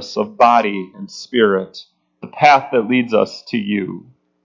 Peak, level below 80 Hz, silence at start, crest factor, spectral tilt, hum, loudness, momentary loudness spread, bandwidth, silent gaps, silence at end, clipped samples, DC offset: 0 dBFS; -64 dBFS; 0 s; 16 dB; -5.5 dB/octave; none; -16 LUFS; 19 LU; 7.6 kHz; none; 0.45 s; under 0.1%; under 0.1%